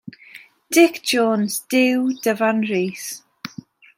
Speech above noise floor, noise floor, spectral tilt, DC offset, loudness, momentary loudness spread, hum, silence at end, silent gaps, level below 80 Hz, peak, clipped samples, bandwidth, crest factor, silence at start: 27 dB; -45 dBFS; -4 dB/octave; under 0.1%; -19 LUFS; 19 LU; none; 0.5 s; none; -72 dBFS; -2 dBFS; under 0.1%; 16.5 kHz; 18 dB; 0.05 s